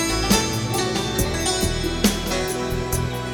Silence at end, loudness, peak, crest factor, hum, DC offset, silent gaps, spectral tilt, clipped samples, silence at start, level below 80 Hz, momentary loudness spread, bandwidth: 0 s; -22 LUFS; -2 dBFS; 20 dB; none; under 0.1%; none; -4 dB/octave; under 0.1%; 0 s; -32 dBFS; 5 LU; over 20 kHz